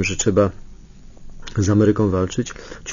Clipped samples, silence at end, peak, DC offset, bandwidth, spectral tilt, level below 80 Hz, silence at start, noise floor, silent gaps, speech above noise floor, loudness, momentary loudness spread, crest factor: under 0.1%; 0 s; -4 dBFS; under 0.1%; 7.6 kHz; -5.5 dB/octave; -38 dBFS; 0 s; -40 dBFS; none; 22 dB; -19 LUFS; 14 LU; 16 dB